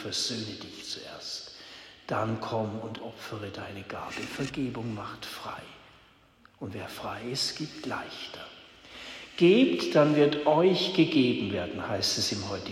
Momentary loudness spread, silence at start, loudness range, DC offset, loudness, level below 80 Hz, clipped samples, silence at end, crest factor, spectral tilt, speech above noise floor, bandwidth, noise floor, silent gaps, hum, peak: 19 LU; 0 s; 13 LU; under 0.1%; -28 LUFS; -64 dBFS; under 0.1%; 0 s; 20 dB; -4.5 dB/octave; 31 dB; 16 kHz; -60 dBFS; none; none; -10 dBFS